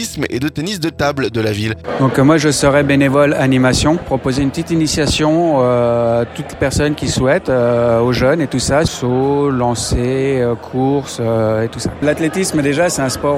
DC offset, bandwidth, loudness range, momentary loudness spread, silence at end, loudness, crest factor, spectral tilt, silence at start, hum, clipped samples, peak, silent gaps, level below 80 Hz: under 0.1%; 16 kHz; 3 LU; 6 LU; 0 s; -15 LUFS; 14 dB; -5 dB/octave; 0 s; none; under 0.1%; 0 dBFS; none; -34 dBFS